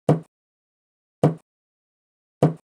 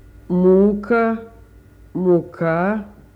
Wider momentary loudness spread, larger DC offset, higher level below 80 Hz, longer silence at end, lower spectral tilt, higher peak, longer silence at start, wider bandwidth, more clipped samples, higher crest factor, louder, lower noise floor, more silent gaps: second, 3 LU vs 12 LU; neither; second, -66 dBFS vs -46 dBFS; about the same, 0.15 s vs 0.25 s; second, -9 dB/octave vs -10.5 dB/octave; about the same, -4 dBFS vs -4 dBFS; second, 0.1 s vs 0.3 s; first, 10.5 kHz vs 4.6 kHz; neither; first, 22 dB vs 14 dB; second, -24 LUFS vs -18 LUFS; first, under -90 dBFS vs -45 dBFS; first, 0.28-1.22 s, 1.42-2.41 s vs none